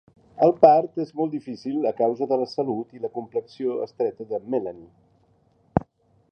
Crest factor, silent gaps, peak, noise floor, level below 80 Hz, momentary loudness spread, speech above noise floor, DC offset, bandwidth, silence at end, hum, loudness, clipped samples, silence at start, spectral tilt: 24 dB; none; -2 dBFS; -62 dBFS; -56 dBFS; 15 LU; 39 dB; under 0.1%; 6.6 kHz; 0.5 s; none; -24 LUFS; under 0.1%; 0.35 s; -8.5 dB/octave